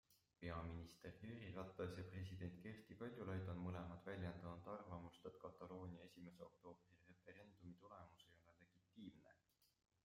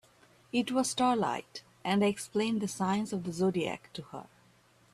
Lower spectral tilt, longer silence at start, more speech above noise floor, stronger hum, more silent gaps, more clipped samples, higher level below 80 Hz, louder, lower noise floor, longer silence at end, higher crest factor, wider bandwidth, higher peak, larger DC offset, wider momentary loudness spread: first, -7.5 dB/octave vs -5 dB/octave; second, 0.1 s vs 0.55 s; second, 28 dB vs 33 dB; neither; neither; neither; second, -76 dBFS vs -70 dBFS; second, -55 LUFS vs -31 LUFS; first, -82 dBFS vs -64 dBFS; second, 0.4 s vs 0.7 s; about the same, 20 dB vs 16 dB; first, 15.5 kHz vs 14 kHz; second, -36 dBFS vs -16 dBFS; neither; second, 13 LU vs 16 LU